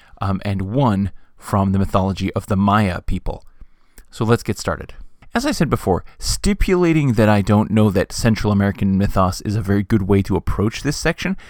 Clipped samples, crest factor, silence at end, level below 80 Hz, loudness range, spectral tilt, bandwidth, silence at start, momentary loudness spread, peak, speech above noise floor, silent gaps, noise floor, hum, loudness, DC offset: under 0.1%; 18 dB; 0 s; -30 dBFS; 5 LU; -6.5 dB/octave; 18.5 kHz; 0.2 s; 10 LU; 0 dBFS; 25 dB; none; -43 dBFS; none; -19 LUFS; under 0.1%